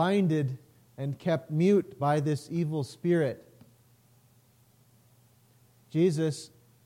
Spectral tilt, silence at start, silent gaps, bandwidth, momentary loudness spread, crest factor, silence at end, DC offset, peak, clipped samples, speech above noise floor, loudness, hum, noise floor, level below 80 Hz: -7.5 dB/octave; 0 s; none; 16 kHz; 13 LU; 16 dB; 0.4 s; under 0.1%; -14 dBFS; under 0.1%; 35 dB; -29 LUFS; none; -63 dBFS; -74 dBFS